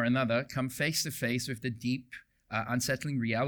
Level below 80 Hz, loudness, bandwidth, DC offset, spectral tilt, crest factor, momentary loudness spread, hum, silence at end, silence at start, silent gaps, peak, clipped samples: -64 dBFS; -32 LUFS; over 20 kHz; under 0.1%; -4.5 dB/octave; 14 dB; 8 LU; none; 0 s; 0 s; none; -18 dBFS; under 0.1%